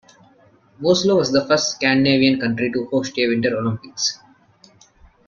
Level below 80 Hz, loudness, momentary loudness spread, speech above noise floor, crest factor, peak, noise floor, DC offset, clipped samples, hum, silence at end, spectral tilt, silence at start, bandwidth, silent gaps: -56 dBFS; -19 LUFS; 8 LU; 35 dB; 18 dB; -2 dBFS; -53 dBFS; under 0.1%; under 0.1%; none; 1.15 s; -4 dB/octave; 0.8 s; 7.4 kHz; none